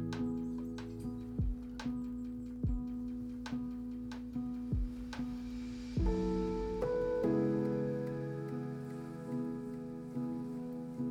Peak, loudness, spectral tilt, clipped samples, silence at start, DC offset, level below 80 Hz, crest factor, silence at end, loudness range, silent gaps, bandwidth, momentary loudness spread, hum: -22 dBFS; -39 LUFS; -8.5 dB/octave; under 0.1%; 0 s; under 0.1%; -46 dBFS; 14 dB; 0 s; 5 LU; none; 11 kHz; 9 LU; none